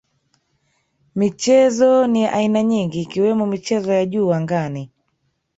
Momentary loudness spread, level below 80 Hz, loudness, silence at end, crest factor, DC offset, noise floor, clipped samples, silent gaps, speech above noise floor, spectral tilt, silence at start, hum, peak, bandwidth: 9 LU; -60 dBFS; -18 LUFS; 0.7 s; 16 dB; under 0.1%; -69 dBFS; under 0.1%; none; 52 dB; -6 dB/octave; 1.15 s; none; -4 dBFS; 8 kHz